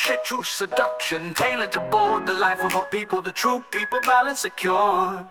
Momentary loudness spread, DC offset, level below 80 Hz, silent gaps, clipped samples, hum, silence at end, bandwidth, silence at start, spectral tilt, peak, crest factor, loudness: 6 LU; under 0.1%; -64 dBFS; none; under 0.1%; none; 0 s; 19.5 kHz; 0 s; -2.5 dB/octave; -6 dBFS; 16 dB; -22 LUFS